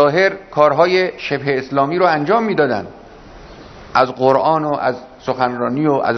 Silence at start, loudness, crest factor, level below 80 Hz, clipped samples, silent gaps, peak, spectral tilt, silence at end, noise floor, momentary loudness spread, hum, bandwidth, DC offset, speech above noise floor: 0 s; -16 LUFS; 16 dB; -50 dBFS; under 0.1%; none; 0 dBFS; -6.5 dB/octave; 0 s; -38 dBFS; 8 LU; none; 6.4 kHz; under 0.1%; 23 dB